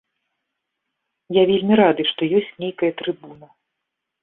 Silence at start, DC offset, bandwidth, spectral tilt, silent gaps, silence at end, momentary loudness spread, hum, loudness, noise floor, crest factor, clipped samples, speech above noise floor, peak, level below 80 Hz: 1.3 s; under 0.1%; 4.1 kHz; -10.5 dB/octave; none; 0.9 s; 13 LU; none; -19 LUFS; -80 dBFS; 20 dB; under 0.1%; 61 dB; -2 dBFS; -64 dBFS